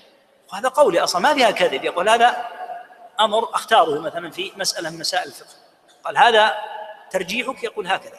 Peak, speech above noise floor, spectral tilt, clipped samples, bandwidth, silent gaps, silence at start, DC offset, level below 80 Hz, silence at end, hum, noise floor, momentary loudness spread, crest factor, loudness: -2 dBFS; 34 dB; -2 dB/octave; under 0.1%; 15 kHz; none; 0.5 s; under 0.1%; -66 dBFS; 0 s; none; -53 dBFS; 17 LU; 18 dB; -19 LUFS